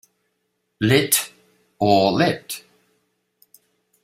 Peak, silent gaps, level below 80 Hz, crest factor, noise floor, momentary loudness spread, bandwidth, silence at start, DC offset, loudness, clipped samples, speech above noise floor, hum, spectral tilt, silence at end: -2 dBFS; none; -56 dBFS; 22 dB; -73 dBFS; 17 LU; 16 kHz; 0.8 s; under 0.1%; -19 LUFS; under 0.1%; 55 dB; none; -4 dB/octave; 1.45 s